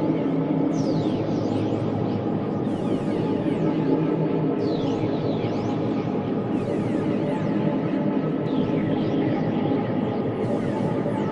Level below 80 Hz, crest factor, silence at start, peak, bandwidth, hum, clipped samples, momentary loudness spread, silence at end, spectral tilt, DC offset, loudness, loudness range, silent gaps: -54 dBFS; 14 dB; 0 s; -8 dBFS; 9.8 kHz; none; under 0.1%; 2 LU; 0 s; -8.5 dB/octave; under 0.1%; -24 LUFS; 1 LU; none